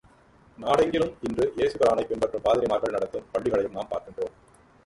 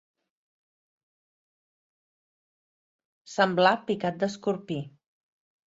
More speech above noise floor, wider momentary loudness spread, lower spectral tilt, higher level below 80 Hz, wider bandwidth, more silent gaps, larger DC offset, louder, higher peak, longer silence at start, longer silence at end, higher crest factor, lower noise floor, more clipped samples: second, 31 dB vs over 64 dB; second, 11 LU vs 14 LU; about the same, -5.5 dB/octave vs -5.5 dB/octave; first, -54 dBFS vs -74 dBFS; first, 11.5 kHz vs 8 kHz; neither; neither; about the same, -26 LUFS vs -27 LUFS; second, -10 dBFS vs -6 dBFS; second, 0.6 s vs 3.3 s; second, 0.55 s vs 0.8 s; second, 18 dB vs 24 dB; second, -56 dBFS vs under -90 dBFS; neither